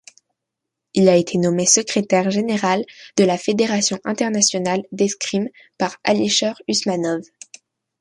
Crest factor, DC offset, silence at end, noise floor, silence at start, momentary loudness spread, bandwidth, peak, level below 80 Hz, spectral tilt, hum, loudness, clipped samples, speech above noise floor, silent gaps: 18 dB; under 0.1%; 0.75 s; -81 dBFS; 0.95 s; 10 LU; 11.5 kHz; -2 dBFS; -62 dBFS; -3.5 dB/octave; none; -19 LUFS; under 0.1%; 63 dB; none